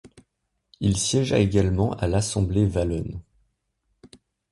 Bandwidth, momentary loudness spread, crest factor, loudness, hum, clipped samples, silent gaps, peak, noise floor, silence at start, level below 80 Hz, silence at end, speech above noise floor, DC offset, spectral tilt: 11.5 kHz; 8 LU; 18 dB; -23 LUFS; none; under 0.1%; none; -6 dBFS; -76 dBFS; 0.05 s; -38 dBFS; 0.45 s; 54 dB; under 0.1%; -5.5 dB/octave